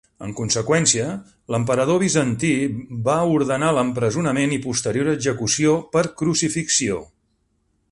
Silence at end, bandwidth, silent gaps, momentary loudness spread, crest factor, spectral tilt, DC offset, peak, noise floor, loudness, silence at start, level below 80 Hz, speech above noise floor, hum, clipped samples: 0.85 s; 11.5 kHz; none; 8 LU; 18 dB; -4 dB/octave; under 0.1%; -4 dBFS; -67 dBFS; -20 LUFS; 0.2 s; -52 dBFS; 47 dB; none; under 0.1%